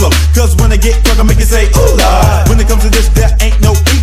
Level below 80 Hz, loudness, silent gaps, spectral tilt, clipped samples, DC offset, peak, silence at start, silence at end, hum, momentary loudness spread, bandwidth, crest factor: -8 dBFS; -9 LUFS; none; -5 dB/octave; 0.6%; under 0.1%; 0 dBFS; 0 s; 0 s; none; 2 LU; 15.5 kHz; 6 dB